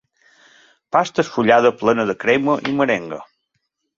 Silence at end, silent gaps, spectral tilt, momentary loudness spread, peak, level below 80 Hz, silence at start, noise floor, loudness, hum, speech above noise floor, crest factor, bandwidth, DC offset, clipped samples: 0.75 s; none; -5.5 dB/octave; 8 LU; -2 dBFS; -60 dBFS; 0.95 s; -73 dBFS; -17 LUFS; none; 56 dB; 18 dB; 7.6 kHz; under 0.1%; under 0.1%